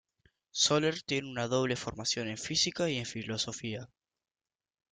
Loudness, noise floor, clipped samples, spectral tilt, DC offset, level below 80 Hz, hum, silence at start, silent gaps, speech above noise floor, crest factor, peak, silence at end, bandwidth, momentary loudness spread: -32 LUFS; under -90 dBFS; under 0.1%; -3 dB/octave; under 0.1%; -66 dBFS; none; 0.55 s; none; over 57 dB; 20 dB; -14 dBFS; 1.05 s; 11 kHz; 11 LU